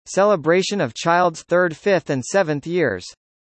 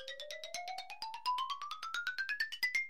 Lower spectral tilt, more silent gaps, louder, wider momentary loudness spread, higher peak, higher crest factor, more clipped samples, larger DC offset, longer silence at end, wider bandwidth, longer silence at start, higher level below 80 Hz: first, -5 dB/octave vs 2 dB/octave; neither; first, -19 LUFS vs -39 LUFS; second, 5 LU vs 9 LU; first, -4 dBFS vs -24 dBFS; about the same, 16 dB vs 18 dB; neither; second, under 0.1% vs 0.2%; first, 0.35 s vs 0 s; second, 8.8 kHz vs 16 kHz; about the same, 0.05 s vs 0 s; first, -62 dBFS vs -82 dBFS